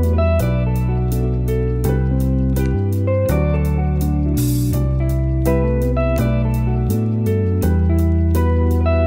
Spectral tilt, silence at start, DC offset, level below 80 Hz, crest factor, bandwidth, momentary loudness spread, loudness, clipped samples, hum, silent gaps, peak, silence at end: -8 dB/octave; 0 s; under 0.1%; -22 dBFS; 12 dB; 16.5 kHz; 2 LU; -18 LUFS; under 0.1%; none; none; -4 dBFS; 0 s